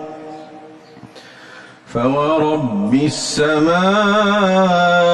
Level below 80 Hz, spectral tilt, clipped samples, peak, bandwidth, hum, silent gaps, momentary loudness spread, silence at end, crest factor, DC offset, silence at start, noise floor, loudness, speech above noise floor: -52 dBFS; -5 dB/octave; under 0.1%; -4 dBFS; 12 kHz; none; none; 16 LU; 0 s; 12 dB; under 0.1%; 0 s; -39 dBFS; -15 LUFS; 25 dB